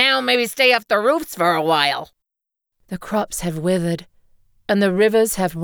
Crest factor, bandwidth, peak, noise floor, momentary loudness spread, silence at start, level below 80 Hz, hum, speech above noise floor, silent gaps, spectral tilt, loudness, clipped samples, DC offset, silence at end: 18 dB; over 20 kHz; -2 dBFS; -84 dBFS; 12 LU; 0 s; -50 dBFS; none; 66 dB; none; -4 dB/octave; -18 LUFS; under 0.1%; under 0.1%; 0 s